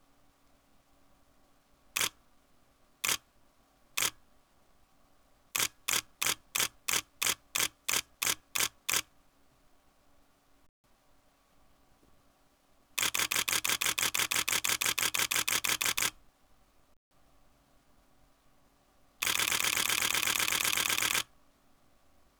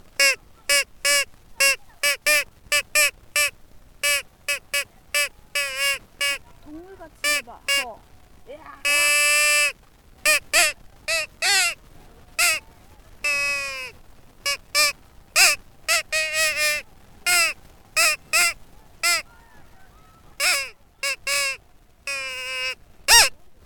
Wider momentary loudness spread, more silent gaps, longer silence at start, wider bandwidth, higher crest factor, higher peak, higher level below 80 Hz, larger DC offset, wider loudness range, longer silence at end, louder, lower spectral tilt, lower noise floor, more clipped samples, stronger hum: second, 5 LU vs 12 LU; first, 10.69-10.84 s, 16.97-17.11 s vs none; first, 1.95 s vs 0.2 s; about the same, over 20 kHz vs 19 kHz; about the same, 22 dB vs 22 dB; second, -14 dBFS vs -2 dBFS; second, -66 dBFS vs -52 dBFS; neither; first, 9 LU vs 6 LU; first, 1.15 s vs 0.1 s; second, -30 LUFS vs -20 LUFS; about the same, 1 dB/octave vs 2 dB/octave; first, -67 dBFS vs -52 dBFS; neither; neither